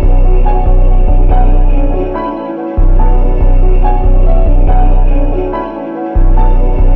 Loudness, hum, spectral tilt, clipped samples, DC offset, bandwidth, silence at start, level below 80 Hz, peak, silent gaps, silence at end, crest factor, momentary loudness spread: -13 LUFS; none; -11.5 dB/octave; under 0.1%; under 0.1%; 3 kHz; 0 s; -6 dBFS; 0 dBFS; none; 0 s; 6 dB; 6 LU